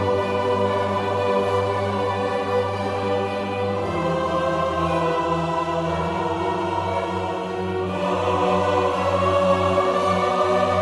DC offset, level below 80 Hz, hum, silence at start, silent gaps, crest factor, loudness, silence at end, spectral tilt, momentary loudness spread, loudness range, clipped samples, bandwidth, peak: under 0.1%; -48 dBFS; none; 0 s; none; 16 dB; -22 LUFS; 0 s; -6 dB/octave; 5 LU; 3 LU; under 0.1%; 11.5 kHz; -6 dBFS